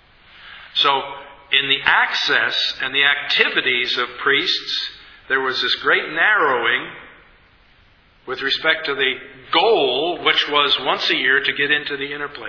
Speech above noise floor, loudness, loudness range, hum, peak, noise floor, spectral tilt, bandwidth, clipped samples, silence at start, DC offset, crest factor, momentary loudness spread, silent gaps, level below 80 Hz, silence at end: 34 dB; -17 LUFS; 4 LU; none; 0 dBFS; -53 dBFS; -2.5 dB/octave; 5.4 kHz; under 0.1%; 0.4 s; under 0.1%; 20 dB; 9 LU; none; -58 dBFS; 0 s